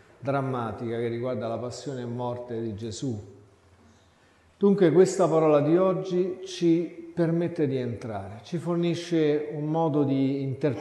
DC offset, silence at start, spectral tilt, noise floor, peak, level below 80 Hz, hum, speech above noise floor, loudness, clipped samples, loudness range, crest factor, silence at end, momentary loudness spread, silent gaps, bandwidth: under 0.1%; 0.2 s; -7 dB/octave; -60 dBFS; -8 dBFS; -62 dBFS; none; 34 dB; -26 LUFS; under 0.1%; 9 LU; 18 dB; 0 s; 13 LU; none; 11.5 kHz